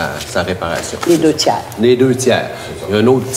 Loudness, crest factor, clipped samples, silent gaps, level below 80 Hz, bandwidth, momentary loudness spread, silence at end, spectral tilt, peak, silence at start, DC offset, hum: -14 LUFS; 14 dB; under 0.1%; none; -44 dBFS; 16 kHz; 8 LU; 0 s; -4.5 dB/octave; 0 dBFS; 0 s; under 0.1%; none